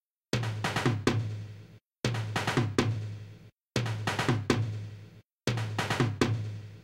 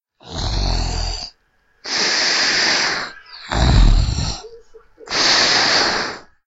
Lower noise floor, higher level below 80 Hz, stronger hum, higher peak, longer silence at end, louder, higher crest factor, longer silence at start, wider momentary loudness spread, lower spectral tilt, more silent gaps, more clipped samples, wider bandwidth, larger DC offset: second, -52 dBFS vs -60 dBFS; second, -56 dBFS vs -22 dBFS; neither; second, -10 dBFS vs 0 dBFS; second, 0 s vs 0.25 s; second, -31 LUFS vs -17 LUFS; about the same, 22 dB vs 18 dB; about the same, 0.35 s vs 0.25 s; second, 14 LU vs 17 LU; first, -5.5 dB/octave vs -2.5 dB/octave; first, 3.53-3.57 s, 5.33-5.38 s vs none; neither; first, 15 kHz vs 8 kHz; neither